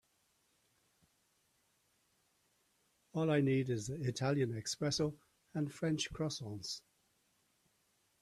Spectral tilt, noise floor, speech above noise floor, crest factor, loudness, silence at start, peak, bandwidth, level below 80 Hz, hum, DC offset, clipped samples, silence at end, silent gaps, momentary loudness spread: -5.5 dB/octave; -77 dBFS; 41 dB; 20 dB; -37 LUFS; 3.15 s; -20 dBFS; 13.5 kHz; -68 dBFS; none; under 0.1%; under 0.1%; 1.4 s; none; 11 LU